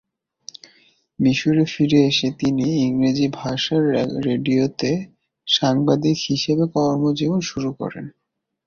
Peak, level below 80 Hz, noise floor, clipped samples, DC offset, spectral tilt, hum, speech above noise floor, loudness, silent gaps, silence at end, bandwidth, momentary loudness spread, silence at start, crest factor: -4 dBFS; -56 dBFS; -57 dBFS; under 0.1%; under 0.1%; -6 dB/octave; none; 38 dB; -20 LUFS; none; 0.55 s; 7.2 kHz; 13 LU; 1.2 s; 16 dB